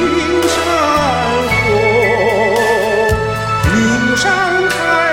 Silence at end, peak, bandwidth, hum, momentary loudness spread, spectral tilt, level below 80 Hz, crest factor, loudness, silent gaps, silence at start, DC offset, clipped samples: 0 s; 0 dBFS; 16.5 kHz; none; 2 LU; -4.5 dB/octave; -32 dBFS; 12 dB; -13 LUFS; none; 0 s; under 0.1%; under 0.1%